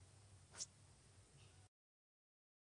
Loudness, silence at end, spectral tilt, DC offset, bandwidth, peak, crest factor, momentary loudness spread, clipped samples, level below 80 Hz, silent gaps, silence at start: -58 LUFS; 1 s; -1.5 dB/octave; under 0.1%; 10 kHz; -36 dBFS; 28 dB; 15 LU; under 0.1%; -80 dBFS; none; 0 s